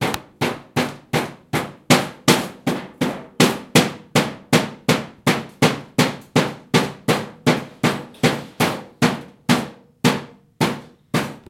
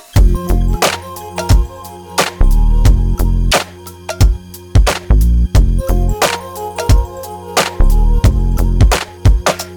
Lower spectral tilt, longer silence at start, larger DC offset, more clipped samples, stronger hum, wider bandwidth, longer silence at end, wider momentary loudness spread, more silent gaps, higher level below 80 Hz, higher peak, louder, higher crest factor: about the same, -4.5 dB/octave vs -5 dB/octave; second, 0 s vs 0.15 s; neither; neither; neither; second, 17 kHz vs 19 kHz; about the same, 0.1 s vs 0 s; second, 8 LU vs 11 LU; neither; second, -56 dBFS vs -12 dBFS; about the same, 0 dBFS vs 0 dBFS; second, -21 LUFS vs -15 LUFS; first, 20 dB vs 12 dB